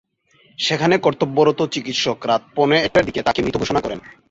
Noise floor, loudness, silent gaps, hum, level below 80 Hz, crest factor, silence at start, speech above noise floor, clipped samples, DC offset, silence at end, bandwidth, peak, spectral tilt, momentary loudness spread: -56 dBFS; -18 LUFS; none; none; -48 dBFS; 18 dB; 0.6 s; 38 dB; under 0.1%; under 0.1%; 0.2 s; 7.8 kHz; -2 dBFS; -4.5 dB/octave; 6 LU